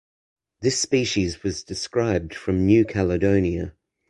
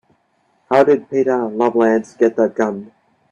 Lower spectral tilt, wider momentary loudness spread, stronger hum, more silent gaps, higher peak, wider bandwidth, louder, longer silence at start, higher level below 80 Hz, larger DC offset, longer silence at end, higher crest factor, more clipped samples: second, -5 dB/octave vs -7 dB/octave; first, 10 LU vs 7 LU; neither; neither; second, -4 dBFS vs 0 dBFS; first, 11.5 kHz vs 9.4 kHz; second, -22 LUFS vs -16 LUFS; about the same, 0.6 s vs 0.7 s; first, -40 dBFS vs -64 dBFS; neither; about the same, 0.4 s vs 0.45 s; about the same, 18 dB vs 18 dB; neither